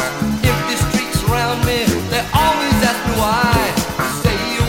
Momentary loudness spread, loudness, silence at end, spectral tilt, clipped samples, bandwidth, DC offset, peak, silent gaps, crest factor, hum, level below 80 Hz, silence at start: 4 LU; -16 LUFS; 0 s; -4.5 dB/octave; under 0.1%; 17 kHz; under 0.1%; -2 dBFS; none; 14 dB; none; -30 dBFS; 0 s